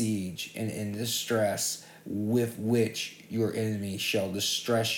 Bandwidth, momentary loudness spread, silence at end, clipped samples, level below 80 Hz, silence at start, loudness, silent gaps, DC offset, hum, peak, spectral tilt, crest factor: 19 kHz; 7 LU; 0 s; under 0.1%; -72 dBFS; 0 s; -30 LUFS; none; under 0.1%; none; -14 dBFS; -4 dB/octave; 16 dB